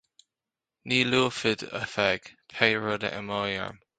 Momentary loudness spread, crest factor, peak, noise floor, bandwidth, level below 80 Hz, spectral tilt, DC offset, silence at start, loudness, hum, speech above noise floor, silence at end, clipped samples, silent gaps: 9 LU; 26 dB; -2 dBFS; -90 dBFS; 9.4 kHz; -62 dBFS; -4 dB/octave; under 0.1%; 0.85 s; -27 LUFS; none; 62 dB; 0.25 s; under 0.1%; none